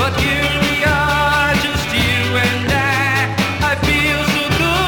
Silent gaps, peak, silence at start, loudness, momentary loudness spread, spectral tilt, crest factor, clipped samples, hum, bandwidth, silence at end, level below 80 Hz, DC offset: none; -4 dBFS; 0 s; -15 LUFS; 2 LU; -4.5 dB/octave; 12 dB; under 0.1%; none; over 20 kHz; 0 s; -30 dBFS; under 0.1%